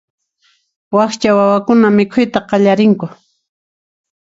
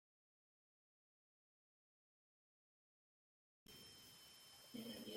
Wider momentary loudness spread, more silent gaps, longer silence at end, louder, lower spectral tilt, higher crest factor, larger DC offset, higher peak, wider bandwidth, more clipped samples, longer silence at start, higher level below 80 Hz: about the same, 6 LU vs 8 LU; neither; first, 1.2 s vs 0 s; first, -12 LUFS vs -58 LUFS; first, -6.5 dB/octave vs -3 dB/octave; second, 14 dB vs 22 dB; neither; first, 0 dBFS vs -40 dBFS; second, 7.8 kHz vs 16.5 kHz; neither; second, 0.9 s vs 3.65 s; first, -54 dBFS vs -90 dBFS